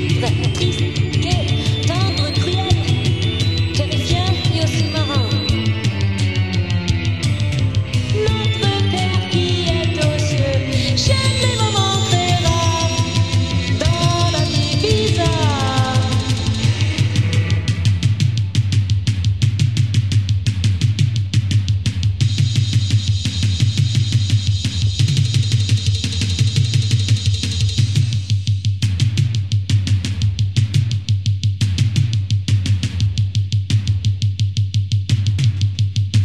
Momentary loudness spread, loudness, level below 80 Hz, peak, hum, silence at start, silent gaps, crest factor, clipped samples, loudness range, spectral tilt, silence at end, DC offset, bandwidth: 3 LU; -17 LUFS; -34 dBFS; -2 dBFS; none; 0 s; none; 14 dB; under 0.1%; 2 LU; -5 dB/octave; 0 s; 0.9%; 11.5 kHz